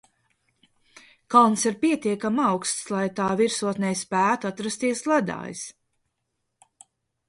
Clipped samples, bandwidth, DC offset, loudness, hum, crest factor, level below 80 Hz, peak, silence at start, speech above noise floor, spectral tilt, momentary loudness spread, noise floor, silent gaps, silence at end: under 0.1%; 11.5 kHz; under 0.1%; -23 LUFS; none; 22 dB; -68 dBFS; -4 dBFS; 1.3 s; 55 dB; -4 dB/octave; 11 LU; -78 dBFS; none; 1.6 s